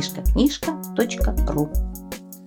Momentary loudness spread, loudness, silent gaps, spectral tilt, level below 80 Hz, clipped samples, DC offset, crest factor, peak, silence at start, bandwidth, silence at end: 12 LU; -23 LUFS; none; -5.5 dB/octave; -26 dBFS; under 0.1%; under 0.1%; 16 dB; -6 dBFS; 0 s; 19.5 kHz; 0 s